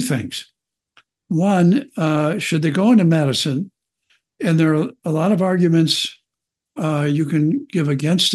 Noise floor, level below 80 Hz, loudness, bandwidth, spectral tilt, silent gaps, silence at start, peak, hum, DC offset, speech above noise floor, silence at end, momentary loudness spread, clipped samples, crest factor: -83 dBFS; -68 dBFS; -18 LUFS; 12.5 kHz; -6 dB/octave; none; 0 s; -4 dBFS; none; under 0.1%; 66 dB; 0 s; 11 LU; under 0.1%; 14 dB